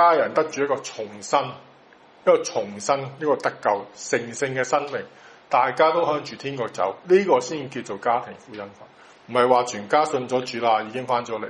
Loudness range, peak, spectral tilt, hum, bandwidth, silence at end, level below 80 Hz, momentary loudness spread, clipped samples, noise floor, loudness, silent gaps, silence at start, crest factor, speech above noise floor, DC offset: 2 LU; -2 dBFS; -4 dB/octave; none; 11 kHz; 0 s; -70 dBFS; 13 LU; under 0.1%; -51 dBFS; -23 LUFS; none; 0 s; 20 dB; 29 dB; under 0.1%